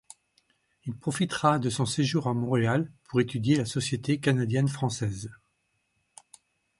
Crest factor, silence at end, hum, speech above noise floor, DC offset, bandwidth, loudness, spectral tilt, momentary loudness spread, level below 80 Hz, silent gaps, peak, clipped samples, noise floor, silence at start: 22 dB; 1.45 s; none; 48 dB; under 0.1%; 11.5 kHz; -27 LUFS; -5.5 dB/octave; 9 LU; -60 dBFS; none; -8 dBFS; under 0.1%; -75 dBFS; 0.85 s